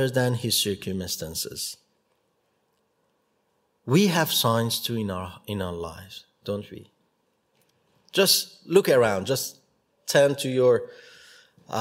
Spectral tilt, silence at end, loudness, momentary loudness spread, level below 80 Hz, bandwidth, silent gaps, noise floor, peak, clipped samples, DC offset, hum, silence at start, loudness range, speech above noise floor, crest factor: -4 dB/octave; 0 s; -24 LUFS; 17 LU; -62 dBFS; 16 kHz; none; -71 dBFS; -6 dBFS; under 0.1%; under 0.1%; none; 0 s; 10 LU; 47 dB; 20 dB